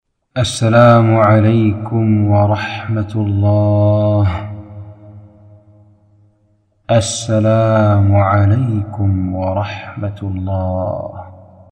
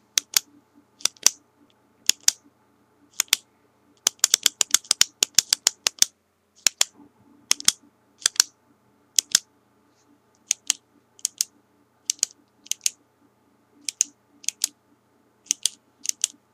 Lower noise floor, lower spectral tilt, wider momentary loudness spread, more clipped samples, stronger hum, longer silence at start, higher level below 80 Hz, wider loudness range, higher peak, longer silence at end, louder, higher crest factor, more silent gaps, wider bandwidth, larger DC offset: second, -57 dBFS vs -63 dBFS; first, -7 dB/octave vs 3 dB/octave; first, 14 LU vs 11 LU; neither; neither; first, 0.35 s vs 0.15 s; first, -44 dBFS vs -74 dBFS; about the same, 8 LU vs 8 LU; about the same, 0 dBFS vs 0 dBFS; about the same, 0.35 s vs 0.25 s; first, -14 LUFS vs -23 LUFS; second, 14 dB vs 28 dB; neither; second, 10 kHz vs 17 kHz; neither